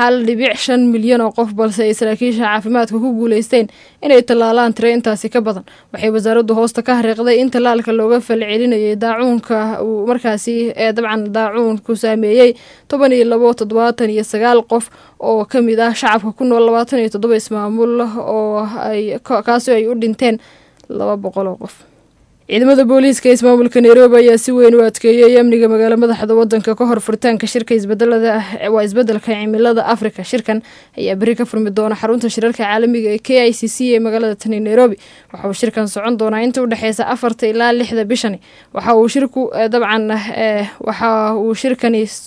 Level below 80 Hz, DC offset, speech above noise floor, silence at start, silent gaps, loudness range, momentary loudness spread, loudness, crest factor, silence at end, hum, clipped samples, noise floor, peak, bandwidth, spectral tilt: -58 dBFS; under 0.1%; 38 dB; 0 s; none; 7 LU; 9 LU; -13 LUFS; 12 dB; 0 s; none; 0.1%; -51 dBFS; 0 dBFS; 11 kHz; -5 dB/octave